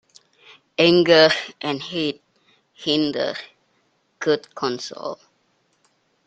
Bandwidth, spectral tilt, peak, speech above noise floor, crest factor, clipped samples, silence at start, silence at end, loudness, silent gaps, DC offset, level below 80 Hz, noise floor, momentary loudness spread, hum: 8.8 kHz; -4.5 dB/octave; 0 dBFS; 46 dB; 22 dB; under 0.1%; 0.8 s; 1.15 s; -20 LUFS; none; under 0.1%; -66 dBFS; -66 dBFS; 19 LU; none